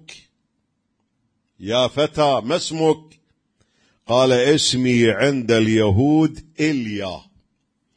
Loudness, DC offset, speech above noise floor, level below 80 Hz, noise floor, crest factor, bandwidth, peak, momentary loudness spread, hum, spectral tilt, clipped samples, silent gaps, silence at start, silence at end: -18 LUFS; under 0.1%; 54 dB; -52 dBFS; -71 dBFS; 16 dB; 10.5 kHz; -4 dBFS; 10 LU; none; -5 dB/octave; under 0.1%; none; 0.1 s; 0.8 s